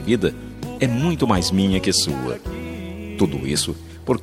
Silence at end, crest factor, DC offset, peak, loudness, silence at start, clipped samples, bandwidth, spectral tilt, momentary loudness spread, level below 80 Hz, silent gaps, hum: 0 s; 20 dB; under 0.1%; -2 dBFS; -21 LUFS; 0 s; under 0.1%; 15.5 kHz; -4.5 dB/octave; 14 LU; -40 dBFS; none; none